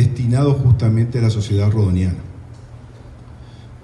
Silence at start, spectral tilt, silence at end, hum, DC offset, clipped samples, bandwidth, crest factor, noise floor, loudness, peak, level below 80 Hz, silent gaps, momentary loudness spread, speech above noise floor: 0 s; -8 dB/octave; 0.05 s; none; under 0.1%; under 0.1%; 10 kHz; 14 dB; -38 dBFS; -17 LUFS; -4 dBFS; -38 dBFS; none; 22 LU; 23 dB